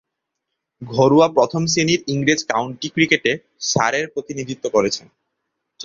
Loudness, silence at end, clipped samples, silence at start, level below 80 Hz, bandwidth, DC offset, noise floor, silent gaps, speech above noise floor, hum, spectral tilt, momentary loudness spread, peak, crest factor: -18 LUFS; 0 s; under 0.1%; 0.8 s; -56 dBFS; 7.6 kHz; under 0.1%; -79 dBFS; none; 61 dB; none; -4 dB/octave; 12 LU; -2 dBFS; 18 dB